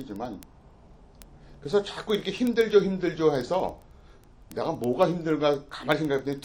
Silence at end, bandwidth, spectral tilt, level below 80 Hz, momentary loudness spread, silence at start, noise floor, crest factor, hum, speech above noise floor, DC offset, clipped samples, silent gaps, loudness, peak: 0.05 s; 17 kHz; -6 dB/octave; -54 dBFS; 14 LU; 0 s; -52 dBFS; 20 dB; none; 26 dB; under 0.1%; under 0.1%; none; -26 LUFS; -8 dBFS